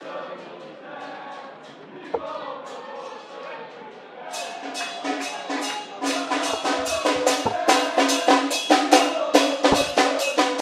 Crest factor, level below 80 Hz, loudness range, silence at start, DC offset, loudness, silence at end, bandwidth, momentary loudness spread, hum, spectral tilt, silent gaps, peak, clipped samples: 24 dB; -56 dBFS; 16 LU; 0 s; under 0.1%; -22 LUFS; 0 s; 16 kHz; 20 LU; none; -2 dB/octave; none; 0 dBFS; under 0.1%